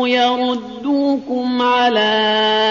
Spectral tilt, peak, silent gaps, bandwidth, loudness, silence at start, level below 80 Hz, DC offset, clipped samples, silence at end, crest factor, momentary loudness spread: -0.5 dB/octave; -4 dBFS; none; 7.2 kHz; -16 LUFS; 0 s; -60 dBFS; under 0.1%; under 0.1%; 0 s; 12 dB; 6 LU